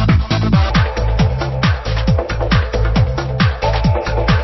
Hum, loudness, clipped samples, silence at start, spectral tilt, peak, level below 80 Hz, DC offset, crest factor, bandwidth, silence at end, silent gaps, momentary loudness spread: none; -16 LUFS; under 0.1%; 0 s; -7 dB/octave; 0 dBFS; -20 dBFS; under 0.1%; 14 dB; 6.2 kHz; 0 s; none; 3 LU